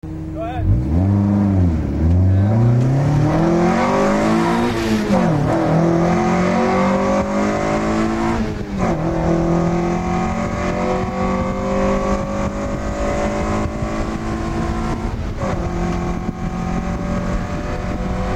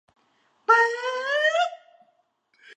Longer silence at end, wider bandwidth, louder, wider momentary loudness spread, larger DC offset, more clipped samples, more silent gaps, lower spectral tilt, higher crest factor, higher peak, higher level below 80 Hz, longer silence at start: about the same, 0 s vs 0.05 s; first, 12.5 kHz vs 10.5 kHz; first, -18 LUFS vs -22 LUFS; about the same, 8 LU vs 10 LU; neither; neither; neither; first, -7.5 dB/octave vs 2 dB/octave; second, 12 dB vs 20 dB; about the same, -4 dBFS vs -6 dBFS; first, -28 dBFS vs -90 dBFS; second, 0.05 s vs 0.7 s